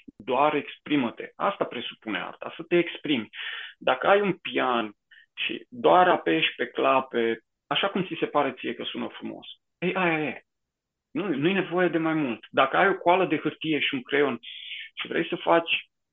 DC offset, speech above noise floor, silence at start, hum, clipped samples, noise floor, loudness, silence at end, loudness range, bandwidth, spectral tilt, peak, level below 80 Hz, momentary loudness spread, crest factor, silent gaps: under 0.1%; 59 dB; 0.2 s; none; under 0.1%; -85 dBFS; -26 LUFS; 0.3 s; 5 LU; 4.1 kHz; -8 dB/octave; -6 dBFS; -74 dBFS; 14 LU; 20 dB; none